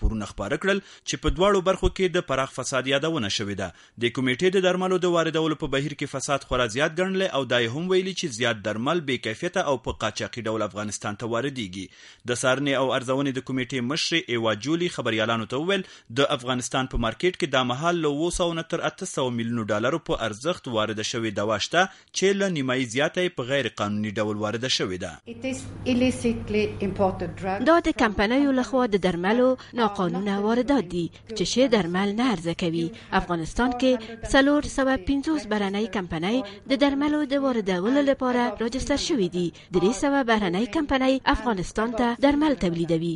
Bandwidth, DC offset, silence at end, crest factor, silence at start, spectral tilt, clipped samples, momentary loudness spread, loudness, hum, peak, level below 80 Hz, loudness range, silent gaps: 11.5 kHz; under 0.1%; 0 s; 20 dB; 0 s; -4.5 dB/octave; under 0.1%; 7 LU; -25 LUFS; none; -4 dBFS; -42 dBFS; 3 LU; none